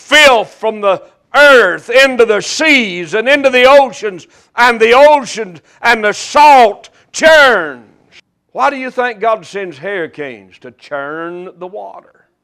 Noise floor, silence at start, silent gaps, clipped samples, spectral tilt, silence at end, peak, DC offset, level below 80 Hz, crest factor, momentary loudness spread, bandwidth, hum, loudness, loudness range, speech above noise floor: -47 dBFS; 0.1 s; none; 0.8%; -2 dB/octave; 0.45 s; 0 dBFS; under 0.1%; -48 dBFS; 10 dB; 19 LU; 16 kHz; none; -9 LUFS; 10 LU; 36 dB